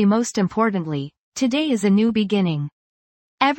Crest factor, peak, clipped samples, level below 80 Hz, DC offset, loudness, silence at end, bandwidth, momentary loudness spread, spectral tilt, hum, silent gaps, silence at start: 18 dB; -2 dBFS; under 0.1%; -60 dBFS; under 0.1%; -21 LUFS; 0 s; 16.5 kHz; 10 LU; -5.5 dB/octave; none; 1.18-1.32 s, 2.72-3.38 s; 0 s